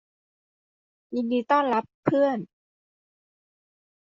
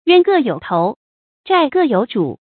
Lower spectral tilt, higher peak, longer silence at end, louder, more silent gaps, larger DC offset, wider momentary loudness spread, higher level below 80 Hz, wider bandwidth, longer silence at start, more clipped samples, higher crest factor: second, -5 dB/octave vs -11 dB/octave; second, -8 dBFS vs 0 dBFS; first, 1.65 s vs 0.2 s; second, -25 LUFS vs -16 LUFS; second, 1.94-2.03 s vs 0.96-1.44 s; neither; about the same, 11 LU vs 9 LU; second, -72 dBFS vs -62 dBFS; first, 7.4 kHz vs 4.6 kHz; first, 1.1 s vs 0.05 s; neither; first, 22 dB vs 16 dB